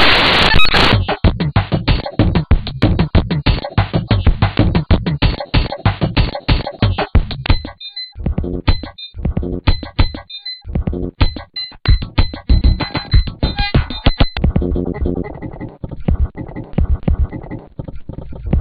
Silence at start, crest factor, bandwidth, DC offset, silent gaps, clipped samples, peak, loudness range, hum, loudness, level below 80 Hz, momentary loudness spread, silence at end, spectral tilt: 0 s; 14 dB; 9.4 kHz; under 0.1%; none; under 0.1%; 0 dBFS; 6 LU; none; -17 LUFS; -20 dBFS; 13 LU; 0 s; -7 dB/octave